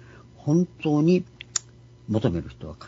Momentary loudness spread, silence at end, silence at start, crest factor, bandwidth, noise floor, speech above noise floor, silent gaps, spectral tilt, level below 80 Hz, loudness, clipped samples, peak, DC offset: 11 LU; 0 s; 0.45 s; 20 dB; 7.8 kHz; -49 dBFS; 26 dB; none; -6 dB/octave; -52 dBFS; -25 LUFS; under 0.1%; -6 dBFS; under 0.1%